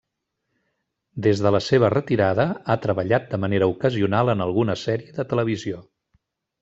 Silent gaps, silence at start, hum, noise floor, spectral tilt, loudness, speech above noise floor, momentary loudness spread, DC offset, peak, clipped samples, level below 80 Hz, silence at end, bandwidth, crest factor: none; 1.15 s; none; -78 dBFS; -7 dB/octave; -22 LUFS; 57 dB; 8 LU; under 0.1%; -4 dBFS; under 0.1%; -58 dBFS; 0.8 s; 8 kHz; 18 dB